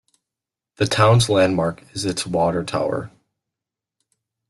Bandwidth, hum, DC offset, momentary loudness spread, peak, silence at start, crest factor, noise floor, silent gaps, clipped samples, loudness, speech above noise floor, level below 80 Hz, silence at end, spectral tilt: 12.5 kHz; none; under 0.1%; 11 LU; -4 dBFS; 0.8 s; 18 dB; -87 dBFS; none; under 0.1%; -20 LUFS; 68 dB; -50 dBFS; 1.4 s; -5 dB/octave